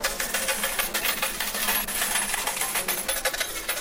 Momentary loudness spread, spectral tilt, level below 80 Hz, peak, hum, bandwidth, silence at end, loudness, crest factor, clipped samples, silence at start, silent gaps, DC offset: 2 LU; 0 dB/octave; -46 dBFS; -10 dBFS; none; 16.5 kHz; 0 s; -25 LUFS; 18 dB; under 0.1%; 0 s; none; under 0.1%